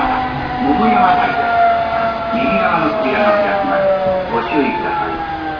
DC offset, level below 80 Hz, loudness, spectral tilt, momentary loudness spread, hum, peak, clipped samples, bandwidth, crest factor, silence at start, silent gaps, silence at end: under 0.1%; -38 dBFS; -15 LUFS; -7.5 dB/octave; 6 LU; none; 0 dBFS; under 0.1%; 5.4 kHz; 14 dB; 0 s; none; 0 s